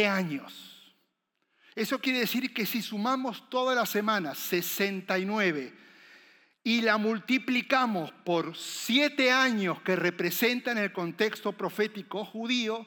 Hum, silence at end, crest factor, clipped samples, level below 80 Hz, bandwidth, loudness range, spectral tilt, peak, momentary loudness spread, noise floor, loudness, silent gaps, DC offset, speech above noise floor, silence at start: none; 0 s; 20 dB; under 0.1%; under -90 dBFS; 19.5 kHz; 4 LU; -4 dB/octave; -10 dBFS; 10 LU; -78 dBFS; -28 LUFS; none; under 0.1%; 49 dB; 0 s